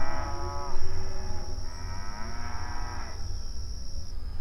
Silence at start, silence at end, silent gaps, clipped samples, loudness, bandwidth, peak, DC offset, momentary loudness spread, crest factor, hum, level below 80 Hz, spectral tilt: 0 s; 0 s; none; under 0.1%; -38 LUFS; 6.2 kHz; -12 dBFS; under 0.1%; 5 LU; 14 dB; none; -32 dBFS; -4.5 dB/octave